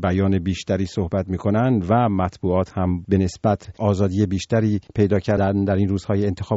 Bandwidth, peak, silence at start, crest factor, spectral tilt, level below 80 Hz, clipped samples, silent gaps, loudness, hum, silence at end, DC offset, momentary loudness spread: 8 kHz; -4 dBFS; 0 s; 16 dB; -7.5 dB/octave; -44 dBFS; under 0.1%; none; -21 LUFS; none; 0 s; under 0.1%; 4 LU